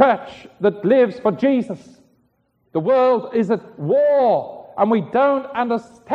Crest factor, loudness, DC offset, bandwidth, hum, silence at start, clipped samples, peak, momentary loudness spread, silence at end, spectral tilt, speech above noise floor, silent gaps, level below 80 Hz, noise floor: 18 dB; -18 LUFS; under 0.1%; 7.6 kHz; none; 0 s; under 0.1%; -2 dBFS; 10 LU; 0 s; -8 dB/octave; 46 dB; none; -64 dBFS; -64 dBFS